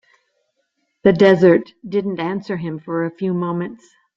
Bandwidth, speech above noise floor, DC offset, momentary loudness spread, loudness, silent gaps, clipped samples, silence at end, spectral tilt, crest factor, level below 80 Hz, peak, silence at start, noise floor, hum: 7.4 kHz; 53 dB; under 0.1%; 14 LU; -18 LUFS; none; under 0.1%; 0.4 s; -8 dB/octave; 18 dB; -58 dBFS; -2 dBFS; 1.05 s; -70 dBFS; none